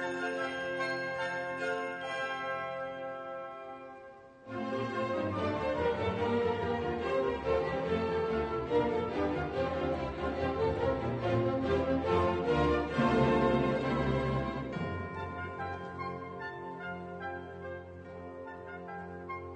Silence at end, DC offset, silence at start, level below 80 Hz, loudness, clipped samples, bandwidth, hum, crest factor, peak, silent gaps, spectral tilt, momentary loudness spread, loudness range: 0 s; under 0.1%; 0 s; -50 dBFS; -33 LUFS; under 0.1%; 9.4 kHz; none; 18 dB; -16 dBFS; none; -7 dB/octave; 14 LU; 10 LU